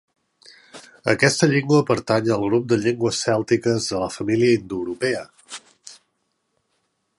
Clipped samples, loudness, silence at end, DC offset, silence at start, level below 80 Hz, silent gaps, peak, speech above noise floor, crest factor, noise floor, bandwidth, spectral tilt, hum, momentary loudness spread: under 0.1%; -20 LUFS; 1.25 s; under 0.1%; 0.75 s; -56 dBFS; none; -2 dBFS; 53 dB; 20 dB; -72 dBFS; 11.5 kHz; -5 dB/octave; none; 12 LU